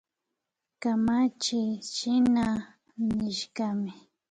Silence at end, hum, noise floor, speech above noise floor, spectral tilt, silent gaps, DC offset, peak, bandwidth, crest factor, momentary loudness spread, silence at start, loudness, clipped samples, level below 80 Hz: 0.4 s; none; -85 dBFS; 58 dB; -4.5 dB/octave; none; under 0.1%; -16 dBFS; 9.4 kHz; 12 dB; 10 LU; 0.8 s; -28 LUFS; under 0.1%; -58 dBFS